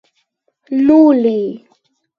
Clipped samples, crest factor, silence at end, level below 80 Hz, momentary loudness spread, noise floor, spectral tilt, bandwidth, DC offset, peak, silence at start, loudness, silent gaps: under 0.1%; 14 dB; 0.6 s; -58 dBFS; 13 LU; -65 dBFS; -9 dB/octave; 5 kHz; under 0.1%; 0 dBFS; 0.7 s; -12 LUFS; none